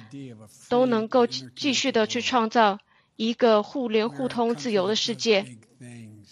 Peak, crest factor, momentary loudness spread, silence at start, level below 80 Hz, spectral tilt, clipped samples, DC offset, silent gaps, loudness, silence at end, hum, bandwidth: -6 dBFS; 18 dB; 18 LU; 0 s; -72 dBFS; -3.5 dB/octave; under 0.1%; under 0.1%; none; -24 LUFS; 0.15 s; none; 11.5 kHz